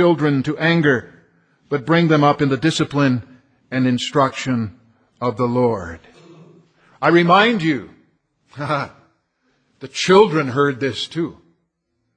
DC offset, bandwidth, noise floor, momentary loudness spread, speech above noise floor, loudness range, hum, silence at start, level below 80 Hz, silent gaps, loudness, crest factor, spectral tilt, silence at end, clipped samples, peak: under 0.1%; 10 kHz; -71 dBFS; 13 LU; 55 dB; 3 LU; none; 0 s; -56 dBFS; none; -18 LUFS; 18 dB; -6 dB/octave; 0.85 s; under 0.1%; 0 dBFS